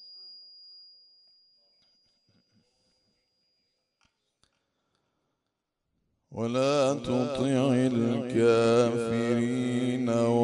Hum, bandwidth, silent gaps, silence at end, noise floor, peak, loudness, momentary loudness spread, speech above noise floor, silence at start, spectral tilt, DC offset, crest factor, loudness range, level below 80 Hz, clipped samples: none; 11 kHz; none; 0 s; -83 dBFS; -12 dBFS; -26 LUFS; 23 LU; 58 dB; 0 s; -6.5 dB/octave; under 0.1%; 18 dB; 8 LU; -66 dBFS; under 0.1%